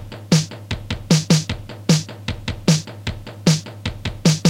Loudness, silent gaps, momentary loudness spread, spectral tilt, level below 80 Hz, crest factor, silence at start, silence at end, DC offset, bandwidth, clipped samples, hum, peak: -21 LUFS; none; 11 LU; -5 dB/octave; -38 dBFS; 18 dB; 0 s; 0 s; under 0.1%; 15.5 kHz; under 0.1%; none; -2 dBFS